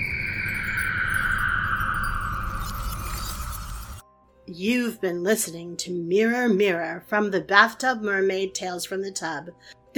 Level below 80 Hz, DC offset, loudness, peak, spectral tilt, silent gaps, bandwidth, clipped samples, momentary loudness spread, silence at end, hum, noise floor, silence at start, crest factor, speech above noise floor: -38 dBFS; under 0.1%; -24 LUFS; 0 dBFS; -4 dB/octave; none; 19 kHz; under 0.1%; 12 LU; 0.25 s; none; -52 dBFS; 0 s; 24 dB; 28 dB